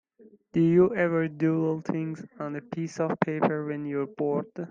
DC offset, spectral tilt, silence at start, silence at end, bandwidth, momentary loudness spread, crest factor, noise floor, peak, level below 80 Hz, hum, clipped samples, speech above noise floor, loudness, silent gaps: under 0.1%; -8.5 dB/octave; 0.55 s; 0 s; 7.4 kHz; 13 LU; 22 dB; -57 dBFS; -6 dBFS; -66 dBFS; none; under 0.1%; 30 dB; -27 LUFS; none